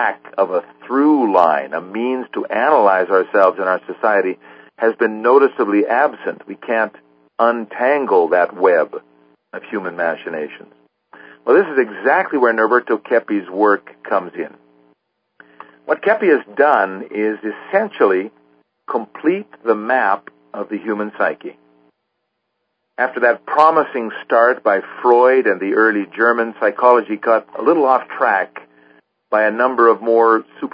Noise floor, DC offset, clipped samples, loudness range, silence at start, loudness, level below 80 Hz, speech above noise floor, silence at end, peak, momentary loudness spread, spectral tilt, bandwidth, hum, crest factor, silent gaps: -73 dBFS; under 0.1%; under 0.1%; 6 LU; 0 s; -16 LUFS; -74 dBFS; 57 dB; 0.05 s; 0 dBFS; 12 LU; -7.5 dB/octave; 5.2 kHz; none; 16 dB; none